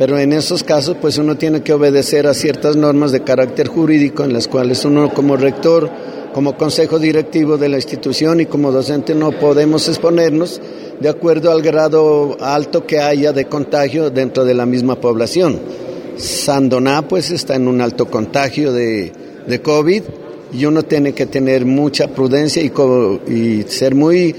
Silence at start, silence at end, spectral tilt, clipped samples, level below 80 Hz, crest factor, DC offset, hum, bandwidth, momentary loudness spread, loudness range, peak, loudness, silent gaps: 0 s; 0 s; -5.5 dB/octave; under 0.1%; -52 dBFS; 12 dB; under 0.1%; none; 16.5 kHz; 6 LU; 3 LU; 0 dBFS; -14 LUFS; none